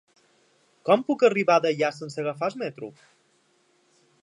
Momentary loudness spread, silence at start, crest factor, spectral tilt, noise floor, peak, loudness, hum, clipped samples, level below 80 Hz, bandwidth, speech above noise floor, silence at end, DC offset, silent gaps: 14 LU; 0.85 s; 20 dB; -5.5 dB/octave; -66 dBFS; -6 dBFS; -24 LUFS; none; under 0.1%; -82 dBFS; 10.5 kHz; 42 dB; 1.35 s; under 0.1%; none